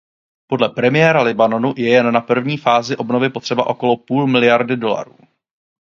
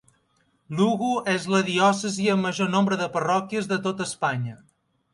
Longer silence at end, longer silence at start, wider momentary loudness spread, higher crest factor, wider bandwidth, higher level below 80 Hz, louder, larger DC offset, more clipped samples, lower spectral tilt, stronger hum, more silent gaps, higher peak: first, 0.9 s vs 0.55 s; second, 0.5 s vs 0.7 s; about the same, 7 LU vs 6 LU; about the same, 16 dB vs 18 dB; second, 7.4 kHz vs 11.5 kHz; first, -62 dBFS vs -68 dBFS; first, -16 LUFS vs -24 LUFS; neither; neither; about the same, -6 dB/octave vs -5 dB/octave; neither; neither; first, 0 dBFS vs -6 dBFS